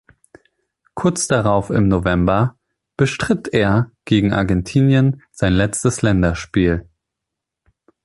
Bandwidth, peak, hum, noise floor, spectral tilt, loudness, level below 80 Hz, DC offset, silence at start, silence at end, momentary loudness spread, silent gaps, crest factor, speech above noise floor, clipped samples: 11.5 kHz; -2 dBFS; none; -82 dBFS; -6 dB/octave; -17 LUFS; -36 dBFS; under 0.1%; 0.95 s; 1.2 s; 5 LU; none; 16 dB; 66 dB; under 0.1%